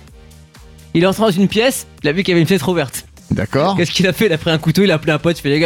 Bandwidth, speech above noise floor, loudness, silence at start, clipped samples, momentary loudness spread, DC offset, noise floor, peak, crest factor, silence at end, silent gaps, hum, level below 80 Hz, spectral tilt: 18 kHz; 26 dB; -15 LUFS; 0.95 s; under 0.1%; 7 LU; under 0.1%; -41 dBFS; -2 dBFS; 12 dB; 0 s; none; none; -42 dBFS; -5.5 dB/octave